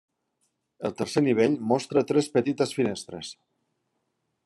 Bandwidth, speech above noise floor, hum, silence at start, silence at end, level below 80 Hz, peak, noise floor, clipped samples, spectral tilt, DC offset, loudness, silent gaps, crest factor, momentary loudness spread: 12.5 kHz; 52 dB; none; 0.8 s; 1.1 s; -72 dBFS; -8 dBFS; -77 dBFS; under 0.1%; -5.5 dB/octave; under 0.1%; -25 LUFS; none; 18 dB; 13 LU